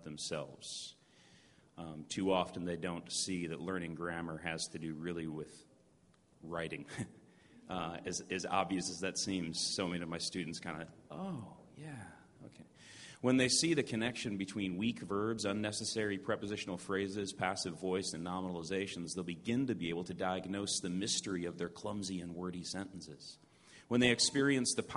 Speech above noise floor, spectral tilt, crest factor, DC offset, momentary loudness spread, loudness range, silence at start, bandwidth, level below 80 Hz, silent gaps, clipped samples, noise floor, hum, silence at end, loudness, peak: 31 dB; -3.5 dB/octave; 26 dB; under 0.1%; 18 LU; 8 LU; 0 s; 11.5 kHz; -68 dBFS; none; under 0.1%; -69 dBFS; none; 0 s; -37 LUFS; -14 dBFS